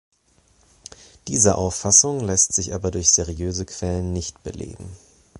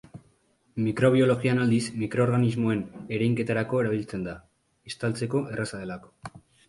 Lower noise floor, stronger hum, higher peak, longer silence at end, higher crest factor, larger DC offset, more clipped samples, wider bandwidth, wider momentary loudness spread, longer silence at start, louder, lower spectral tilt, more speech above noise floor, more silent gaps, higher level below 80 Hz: second, -60 dBFS vs -65 dBFS; neither; first, 0 dBFS vs -8 dBFS; second, 0 s vs 0.3 s; about the same, 22 dB vs 18 dB; neither; neither; about the same, 11.5 kHz vs 11.5 kHz; first, 21 LU vs 18 LU; first, 1.25 s vs 0.15 s; first, -19 LUFS vs -26 LUFS; second, -3.5 dB/octave vs -7 dB/octave; about the same, 38 dB vs 40 dB; neither; first, -38 dBFS vs -58 dBFS